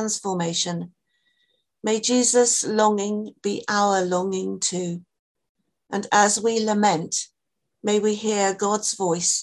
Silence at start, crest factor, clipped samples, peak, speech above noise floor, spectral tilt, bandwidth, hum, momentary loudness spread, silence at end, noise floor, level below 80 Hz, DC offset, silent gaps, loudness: 0 s; 20 dB; under 0.1%; -4 dBFS; 59 dB; -3 dB/octave; 12.5 kHz; none; 13 LU; 0 s; -81 dBFS; -70 dBFS; under 0.1%; 5.19-5.35 s, 5.49-5.55 s; -22 LUFS